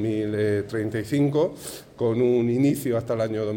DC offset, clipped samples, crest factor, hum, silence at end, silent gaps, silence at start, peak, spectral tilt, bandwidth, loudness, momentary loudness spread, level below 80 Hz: under 0.1%; under 0.1%; 12 dB; none; 0 s; none; 0 s; -10 dBFS; -7 dB/octave; 17 kHz; -24 LUFS; 7 LU; -58 dBFS